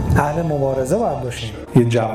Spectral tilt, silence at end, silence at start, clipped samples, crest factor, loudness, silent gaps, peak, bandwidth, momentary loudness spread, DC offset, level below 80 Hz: -7 dB/octave; 0 s; 0 s; under 0.1%; 14 dB; -19 LUFS; none; -4 dBFS; 15.5 kHz; 9 LU; under 0.1%; -34 dBFS